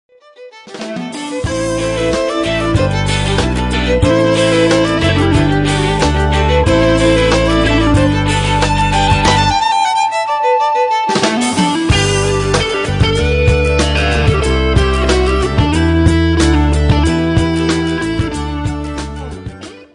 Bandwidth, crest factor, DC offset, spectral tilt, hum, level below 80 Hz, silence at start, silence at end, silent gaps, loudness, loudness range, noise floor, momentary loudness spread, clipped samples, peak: 10.5 kHz; 12 dB; under 0.1%; -5.5 dB/octave; none; -22 dBFS; 0.4 s; 0.1 s; none; -13 LUFS; 3 LU; -38 dBFS; 9 LU; under 0.1%; -2 dBFS